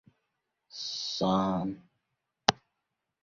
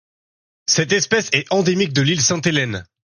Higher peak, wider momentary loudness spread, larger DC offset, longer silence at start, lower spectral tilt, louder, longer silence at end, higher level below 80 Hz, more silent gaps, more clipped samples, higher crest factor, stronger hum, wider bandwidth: about the same, 0 dBFS vs -2 dBFS; first, 19 LU vs 4 LU; neither; about the same, 0.75 s vs 0.7 s; about the same, -4.5 dB/octave vs -3.5 dB/octave; second, -31 LUFS vs -17 LUFS; first, 0.7 s vs 0.25 s; second, -64 dBFS vs -54 dBFS; neither; neither; first, 34 dB vs 16 dB; neither; second, 7.4 kHz vs 11 kHz